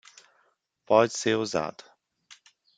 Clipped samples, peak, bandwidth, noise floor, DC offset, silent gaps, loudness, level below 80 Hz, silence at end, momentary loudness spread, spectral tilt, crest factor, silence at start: under 0.1%; -6 dBFS; 9.4 kHz; -70 dBFS; under 0.1%; none; -25 LUFS; -70 dBFS; 1.05 s; 9 LU; -4 dB/octave; 22 dB; 0.9 s